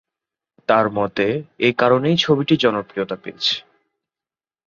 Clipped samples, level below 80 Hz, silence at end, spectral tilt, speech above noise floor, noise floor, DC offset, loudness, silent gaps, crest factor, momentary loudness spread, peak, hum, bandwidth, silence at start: under 0.1%; -58 dBFS; 1.1 s; -5.5 dB/octave; over 72 dB; under -90 dBFS; under 0.1%; -19 LUFS; none; 18 dB; 10 LU; -2 dBFS; none; 7.4 kHz; 0.7 s